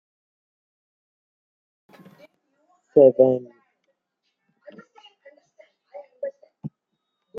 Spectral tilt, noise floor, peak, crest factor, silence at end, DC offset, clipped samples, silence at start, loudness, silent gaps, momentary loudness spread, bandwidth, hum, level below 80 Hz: -10 dB/octave; -78 dBFS; -2 dBFS; 24 dB; 0 s; under 0.1%; under 0.1%; 2.95 s; -18 LUFS; none; 25 LU; 3.2 kHz; none; -74 dBFS